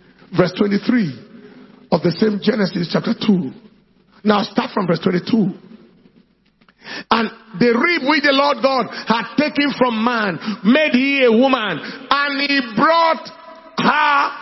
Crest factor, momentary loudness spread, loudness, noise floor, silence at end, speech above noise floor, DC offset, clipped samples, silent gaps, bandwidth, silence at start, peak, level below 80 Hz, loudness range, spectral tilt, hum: 18 dB; 9 LU; -17 LUFS; -56 dBFS; 0 s; 39 dB; under 0.1%; under 0.1%; none; 6 kHz; 0.3 s; 0 dBFS; -58 dBFS; 5 LU; -7 dB/octave; none